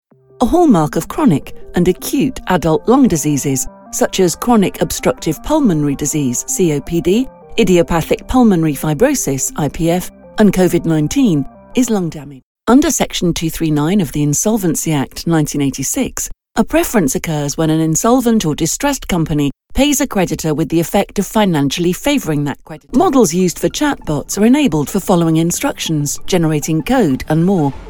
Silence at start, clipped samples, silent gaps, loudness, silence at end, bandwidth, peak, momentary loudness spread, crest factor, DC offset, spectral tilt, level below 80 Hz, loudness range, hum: 0.4 s; under 0.1%; 12.43-12.55 s; -15 LUFS; 0 s; over 20 kHz; 0 dBFS; 7 LU; 14 dB; under 0.1%; -5 dB/octave; -34 dBFS; 2 LU; none